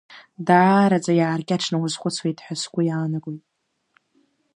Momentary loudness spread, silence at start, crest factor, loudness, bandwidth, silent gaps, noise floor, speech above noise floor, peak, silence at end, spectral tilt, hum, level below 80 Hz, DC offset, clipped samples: 13 LU; 0.1 s; 20 dB; -21 LUFS; 11 kHz; none; -65 dBFS; 45 dB; -2 dBFS; 1.2 s; -5.5 dB/octave; none; -70 dBFS; under 0.1%; under 0.1%